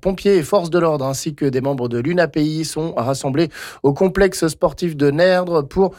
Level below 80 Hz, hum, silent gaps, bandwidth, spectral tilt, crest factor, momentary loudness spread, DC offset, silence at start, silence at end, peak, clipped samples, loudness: -42 dBFS; none; none; 17 kHz; -6 dB/octave; 12 dB; 6 LU; under 0.1%; 0.05 s; 0.05 s; -4 dBFS; under 0.1%; -18 LUFS